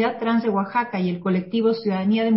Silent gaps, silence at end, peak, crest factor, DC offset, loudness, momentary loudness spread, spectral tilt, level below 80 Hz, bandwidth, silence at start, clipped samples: none; 0 s; -8 dBFS; 12 dB; under 0.1%; -22 LUFS; 3 LU; -11.5 dB/octave; -62 dBFS; 5.8 kHz; 0 s; under 0.1%